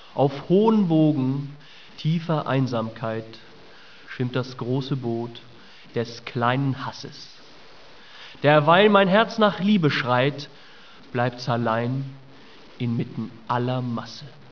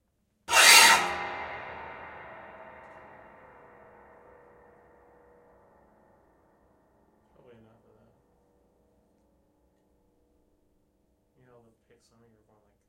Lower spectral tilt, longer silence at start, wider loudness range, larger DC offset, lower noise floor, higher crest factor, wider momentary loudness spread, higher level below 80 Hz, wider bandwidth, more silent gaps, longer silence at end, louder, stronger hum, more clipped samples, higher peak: first, -7.5 dB/octave vs 1.5 dB/octave; second, 0.15 s vs 0.5 s; second, 9 LU vs 29 LU; first, 0.4% vs under 0.1%; second, -48 dBFS vs -71 dBFS; second, 22 dB vs 30 dB; second, 19 LU vs 32 LU; about the same, -66 dBFS vs -68 dBFS; second, 5.4 kHz vs 16 kHz; neither; second, 0.2 s vs 10.95 s; second, -23 LUFS vs -18 LUFS; neither; neither; about the same, -2 dBFS vs -2 dBFS